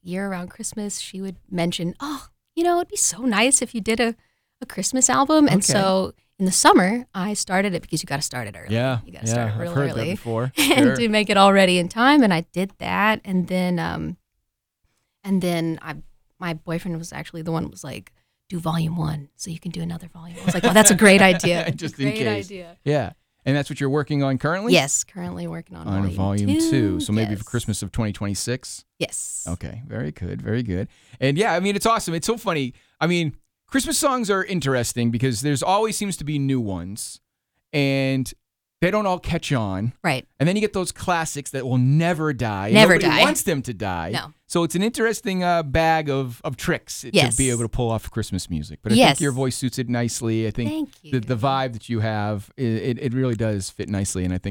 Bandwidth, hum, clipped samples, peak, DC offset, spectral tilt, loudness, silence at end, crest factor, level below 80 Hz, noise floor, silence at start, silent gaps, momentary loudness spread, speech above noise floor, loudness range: over 20 kHz; none; under 0.1%; 0 dBFS; under 0.1%; -4.5 dB/octave; -21 LUFS; 0 s; 20 dB; -48 dBFS; -77 dBFS; 0.05 s; none; 15 LU; 55 dB; 9 LU